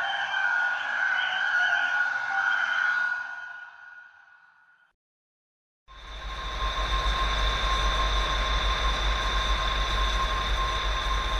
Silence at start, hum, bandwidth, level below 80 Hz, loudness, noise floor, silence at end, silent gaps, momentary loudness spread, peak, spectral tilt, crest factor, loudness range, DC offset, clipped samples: 0 s; none; 11.5 kHz; -32 dBFS; -26 LUFS; -60 dBFS; 0 s; 4.94-5.86 s; 12 LU; -14 dBFS; -2.5 dB/octave; 14 dB; 12 LU; under 0.1%; under 0.1%